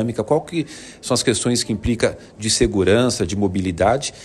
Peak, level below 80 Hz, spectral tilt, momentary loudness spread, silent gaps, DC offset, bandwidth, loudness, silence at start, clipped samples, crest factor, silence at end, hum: -2 dBFS; -38 dBFS; -4.5 dB/octave; 10 LU; none; under 0.1%; 13 kHz; -19 LUFS; 0 s; under 0.1%; 16 dB; 0 s; none